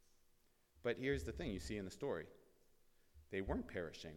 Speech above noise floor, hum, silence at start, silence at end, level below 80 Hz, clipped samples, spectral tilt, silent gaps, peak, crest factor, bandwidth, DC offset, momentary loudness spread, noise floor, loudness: 30 dB; none; 0.75 s; 0 s; -58 dBFS; under 0.1%; -5.5 dB/octave; none; -26 dBFS; 20 dB; 18 kHz; under 0.1%; 7 LU; -74 dBFS; -45 LUFS